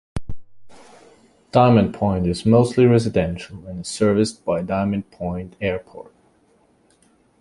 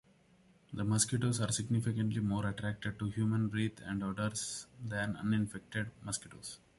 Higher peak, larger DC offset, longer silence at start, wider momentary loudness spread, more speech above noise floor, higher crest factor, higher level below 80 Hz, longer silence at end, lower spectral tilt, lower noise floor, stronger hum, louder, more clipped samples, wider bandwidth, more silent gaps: first, -2 dBFS vs -16 dBFS; neither; second, 0.15 s vs 0.7 s; first, 18 LU vs 9 LU; first, 40 dB vs 31 dB; about the same, 20 dB vs 20 dB; first, -42 dBFS vs -60 dBFS; first, 1.4 s vs 0.25 s; first, -7 dB/octave vs -5 dB/octave; second, -59 dBFS vs -66 dBFS; neither; first, -19 LUFS vs -36 LUFS; neither; about the same, 11.5 kHz vs 11.5 kHz; neither